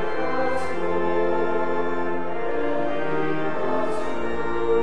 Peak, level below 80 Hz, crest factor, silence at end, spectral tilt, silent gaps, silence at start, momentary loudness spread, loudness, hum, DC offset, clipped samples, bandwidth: -10 dBFS; -50 dBFS; 14 dB; 0 s; -6.5 dB/octave; none; 0 s; 4 LU; -26 LUFS; none; 7%; under 0.1%; 11 kHz